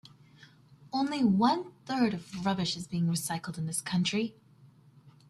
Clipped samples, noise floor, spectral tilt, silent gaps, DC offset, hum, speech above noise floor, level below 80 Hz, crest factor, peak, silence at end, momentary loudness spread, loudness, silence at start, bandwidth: under 0.1%; -58 dBFS; -5 dB/octave; none; under 0.1%; none; 29 dB; -68 dBFS; 18 dB; -14 dBFS; 0.2 s; 9 LU; -30 LUFS; 0.05 s; 14 kHz